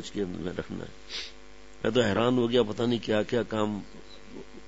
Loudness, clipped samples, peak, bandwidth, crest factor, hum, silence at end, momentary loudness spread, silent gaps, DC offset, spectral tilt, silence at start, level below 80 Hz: -29 LUFS; under 0.1%; -10 dBFS; 8 kHz; 20 dB; none; 0 s; 21 LU; none; 0.5%; -6 dB/octave; 0 s; -56 dBFS